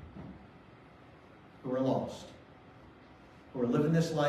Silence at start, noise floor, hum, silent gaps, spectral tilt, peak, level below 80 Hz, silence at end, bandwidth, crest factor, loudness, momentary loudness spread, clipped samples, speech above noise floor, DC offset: 0 s; -56 dBFS; none; none; -7 dB/octave; -16 dBFS; -64 dBFS; 0 s; 13 kHz; 18 dB; -33 LUFS; 27 LU; under 0.1%; 25 dB; under 0.1%